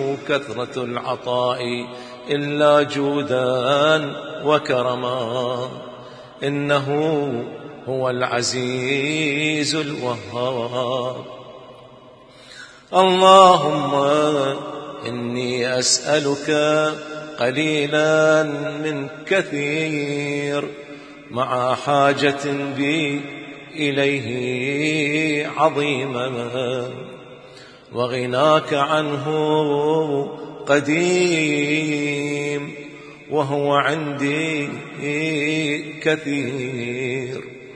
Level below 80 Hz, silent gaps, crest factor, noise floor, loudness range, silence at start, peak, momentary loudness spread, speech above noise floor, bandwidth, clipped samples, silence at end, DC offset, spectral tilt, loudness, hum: -64 dBFS; none; 20 dB; -45 dBFS; 6 LU; 0 s; 0 dBFS; 14 LU; 25 dB; 10.5 kHz; under 0.1%; 0 s; under 0.1%; -4.5 dB/octave; -20 LUFS; none